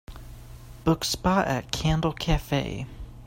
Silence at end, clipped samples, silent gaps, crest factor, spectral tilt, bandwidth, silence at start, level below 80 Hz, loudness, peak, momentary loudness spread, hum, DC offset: 0 s; under 0.1%; none; 22 dB; -5 dB/octave; 16.5 kHz; 0.1 s; -36 dBFS; -26 LUFS; -6 dBFS; 22 LU; none; under 0.1%